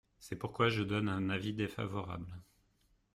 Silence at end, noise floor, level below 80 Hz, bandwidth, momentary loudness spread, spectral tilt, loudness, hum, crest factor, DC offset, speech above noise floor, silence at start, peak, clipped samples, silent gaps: 0.7 s; -73 dBFS; -64 dBFS; 14 kHz; 14 LU; -6.5 dB/octave; -36 LUFS; none; 20 dB; under 0.1%; 37 dB; 0.2 s; -18 dBFS; under 0.1%; none